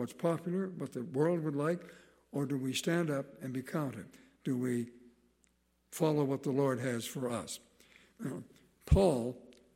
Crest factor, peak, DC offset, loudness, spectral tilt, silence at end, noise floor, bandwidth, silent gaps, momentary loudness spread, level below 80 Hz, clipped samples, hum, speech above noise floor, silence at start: 22 dB; -14 dBFS; under 0.1%; -35 LUFS; -6 dB/octave; 0.25 s; -73 dBFS; 16 kHz; none; 15 LU; -48 dBFS; under 0.1%; none; 40 dB; 0 s